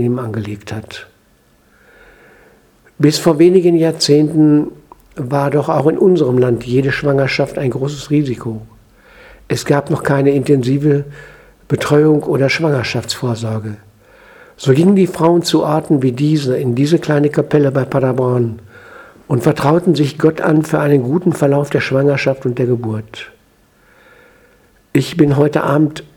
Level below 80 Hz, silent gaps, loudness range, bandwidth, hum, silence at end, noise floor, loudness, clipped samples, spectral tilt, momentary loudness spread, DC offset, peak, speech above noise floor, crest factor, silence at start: -48 dBFS; none; 5 LU; 17 kHz; none; 0.1 s; -53 dBFS; -14 LUFS; under 0.1%; -6.5 dB/octave; 13 LU; under 0.1%; 0 dBFS; 39 dB; 14 dB; 0 s